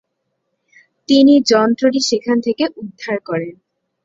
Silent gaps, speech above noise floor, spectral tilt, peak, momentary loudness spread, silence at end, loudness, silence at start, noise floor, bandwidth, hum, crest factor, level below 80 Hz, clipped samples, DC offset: none; 58 dB; -4 dB/octave; -2 dBFS; 14 LU; 0.55 s; -15 LUFS; 1.1 s; -72 dBFS; 7.8 kHz; none; 14 dB; -60 dBFS; under 0.1%; under 0.1%